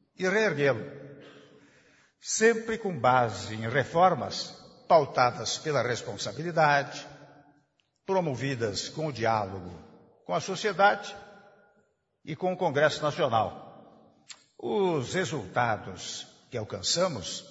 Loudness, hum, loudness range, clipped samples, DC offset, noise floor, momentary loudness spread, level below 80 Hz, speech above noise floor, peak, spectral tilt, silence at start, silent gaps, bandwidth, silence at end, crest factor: -28 LUFS; none; 5 LU; under 0.1%; under 0.1%; -70 dBFS; 18 LU; -66 dBFS; 43 dB; -8 dBFS; -4 dB/octave; 0.2 s; none; 8 kHz; 0 s; 20 dB